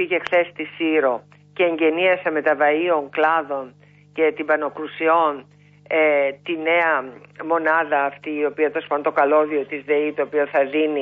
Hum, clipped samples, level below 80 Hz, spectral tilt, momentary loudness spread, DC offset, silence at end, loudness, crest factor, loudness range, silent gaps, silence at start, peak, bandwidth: 50 Hz at -50 dBFS; under 0.1%; -74 dBFS; -6.5 dB/octave; 9 LU; under 0.1%; 0 s; -20 LUFS; 14 dB; 1 LU; none; 0 s; -6 dBFS; 5.4 kHz